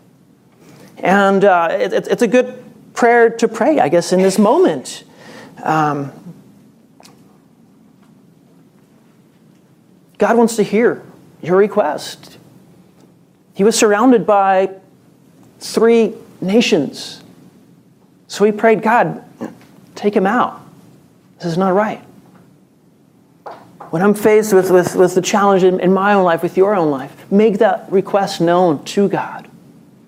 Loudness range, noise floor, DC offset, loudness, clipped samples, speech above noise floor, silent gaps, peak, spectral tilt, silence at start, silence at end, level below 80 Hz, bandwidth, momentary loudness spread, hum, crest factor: 8 LU; -51 dBFS; under 0.1%; -14 LUFS; under 0.1%; 37 dB; none; 0 dBFS; -5.5 dB/octave; 1 s; 0.65 s; -66 dBFS; 16 kHz; 18 LU; none; 16 dB